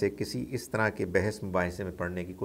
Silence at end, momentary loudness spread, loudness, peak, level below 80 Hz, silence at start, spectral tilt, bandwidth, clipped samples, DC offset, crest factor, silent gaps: 0 s; 6 LU; -31 LUFS; -12 dBFS; -54 dBFS; 0 s; -6 dB/octave; 16 kHz; under 0.1%; under 0.1%; 20 dB; none